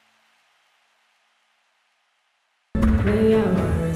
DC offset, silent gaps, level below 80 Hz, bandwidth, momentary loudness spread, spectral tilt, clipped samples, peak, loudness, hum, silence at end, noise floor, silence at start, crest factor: under 0.1%; none; -32 dBFS; 14 kHz; 5 LU; -8.5 dB/octave; under 0.1%; -6 dBFS; -20 LUFS; none; 0 s; -69 dBFS; 2.75 s; 16 dB